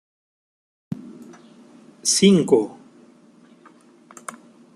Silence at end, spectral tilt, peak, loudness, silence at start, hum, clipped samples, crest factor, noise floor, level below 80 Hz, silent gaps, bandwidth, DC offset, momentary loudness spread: 2.05 s; -4.5 dB/octave; -2 dBFS; -18 LUFS; 0.9 s; none; under 0.1%; 22 dB; -52 dBFS; -66 dBFS; none; 12.5 kHz; under 0.1%; 24 LU